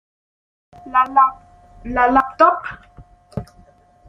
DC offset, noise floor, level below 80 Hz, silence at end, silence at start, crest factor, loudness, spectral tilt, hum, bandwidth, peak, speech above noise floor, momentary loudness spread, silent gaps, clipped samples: under 0.1%; -50 dBFS; -46 dBFS; 0.65 s; 0.85 s; 18 dB; -16 LUFS; -7 dB/octave; none; 9.4 kHz; -2 dBFS; 34 dB; 19 LU; none; under 0.1%